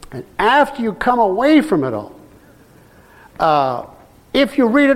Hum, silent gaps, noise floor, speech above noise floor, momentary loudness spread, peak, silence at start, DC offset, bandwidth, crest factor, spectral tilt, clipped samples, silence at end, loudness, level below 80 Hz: none; none; -46 dBFS; 31 dB; 13 LU; -2 dBFS; 0.1 s; under 0.1%; 14.5 kHz; 16 dB; -6 dB/octave; under 0.1%; 0 s; -16 LUFS; -46 dBFS